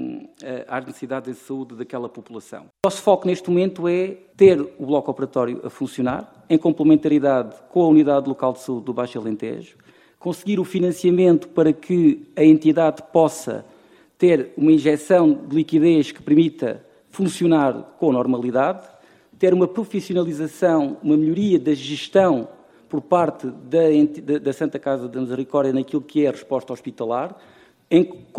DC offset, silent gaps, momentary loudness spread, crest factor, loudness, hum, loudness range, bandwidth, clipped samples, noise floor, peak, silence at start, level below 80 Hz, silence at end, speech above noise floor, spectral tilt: under 0.1%; none; 15 LU; 18 dB; -19 LUFS; none; 5 LU; 12.5 kHz; under 0.1%; -51 dBFS; -2 dBFS; 0 s; -62 dBFS; 0 s; 32 dB; -7 dB/octave